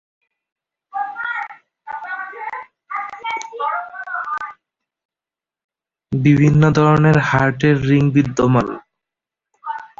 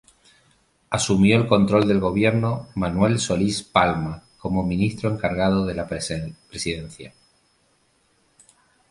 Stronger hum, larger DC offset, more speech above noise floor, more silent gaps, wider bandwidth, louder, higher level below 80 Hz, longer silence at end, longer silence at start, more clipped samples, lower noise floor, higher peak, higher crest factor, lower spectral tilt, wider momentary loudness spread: neither; neither; first, 76 dB vs 43 dB; first, 5.05-5.09 s, 5.64-5.69 s vs none; second, 7.4 kHz vs 11.5 kHz; first, -17 LUFS vs -22 LUFS; about the same, -46 dBFS vs -44 dBFS; second, 0.15 s vs 1.8 s; about the same, 0.95 s vs 0.9 s; neither; first, -89 dBFS vs -64 dBFS; about the same, -2 dBFS vs -2 dBFS; about the same, 18 dB vs 20 dB; first, -7.5 dB/octave vs -5.5 dB/octave; first, 18 LU vs 13 LU